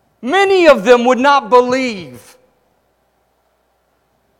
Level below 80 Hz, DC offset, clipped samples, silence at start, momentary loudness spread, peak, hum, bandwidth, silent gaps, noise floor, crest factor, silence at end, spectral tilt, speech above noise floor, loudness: -54 dBFS; under 0.1%; 0.2%; 0.25 s; 9 LU; 0 dBFS; none; 12.5 kHz; none; -61 dBFS; 14 dB; 2.25 s; -4 dB/octave; 50 dB; -11 LUFS